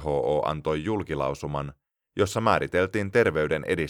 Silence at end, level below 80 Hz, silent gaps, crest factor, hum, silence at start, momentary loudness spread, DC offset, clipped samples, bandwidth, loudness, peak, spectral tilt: 0 s; -48 dBFS; none; 20 dB; none; 0 s; 9 LU; under 0.1%; under 0.1%; 16 kHz; -26 LUFS; -6 dBFS; -6 dB/octave